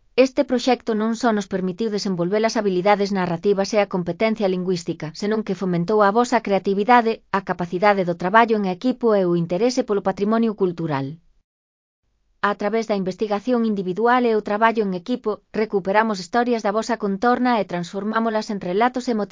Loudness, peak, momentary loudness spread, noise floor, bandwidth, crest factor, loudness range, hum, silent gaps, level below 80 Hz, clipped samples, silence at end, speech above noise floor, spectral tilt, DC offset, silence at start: -21 LUFS; 0 dBFS; 8 LU; under -90 dBFS; 7.6 kHz; 20 dB; 5 LU; none; 11.44-12.03 s; -60 dBFS; under 0.1%; 0.05 s; over 70 dB; -6 dB/octave; under 0.1%; 0.15 s